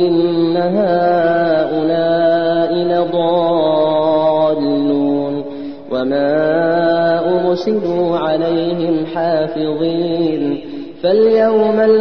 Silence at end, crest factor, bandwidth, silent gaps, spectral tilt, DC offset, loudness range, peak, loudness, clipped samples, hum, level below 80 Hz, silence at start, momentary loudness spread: 0 s; 12 dB; 6 kHz; none; -8.5 dB/octave; 0.9%; 2 LU; -2 dBFS; -15 LUFS; under 0.1%; none; -54 dBFS; 0 s; 6 LU